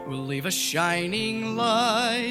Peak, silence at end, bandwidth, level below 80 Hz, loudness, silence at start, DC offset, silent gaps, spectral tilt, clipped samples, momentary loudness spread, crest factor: -8 dBFS; 0 s; 16.5 kHz; -60 dBFS; -24 LUFS; 0 s; under 0.1%; none; -3 dB/octave; under 0.1%; 6 LU; 16 dB